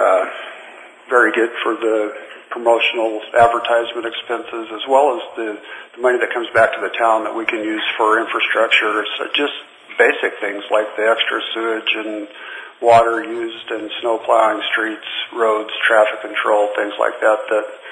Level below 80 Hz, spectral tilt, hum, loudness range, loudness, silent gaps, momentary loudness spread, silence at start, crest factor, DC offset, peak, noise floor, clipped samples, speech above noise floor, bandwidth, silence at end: -60 dBFS; -3.5 dB/octave; none; 2 LU; -17 LUFS; none; 13 LU; 0 s; 18 dB; under 0.1%; 0 dBFS; -39 dBFS; under 0.1%; 22 dB; 10.5 kHz; 0 s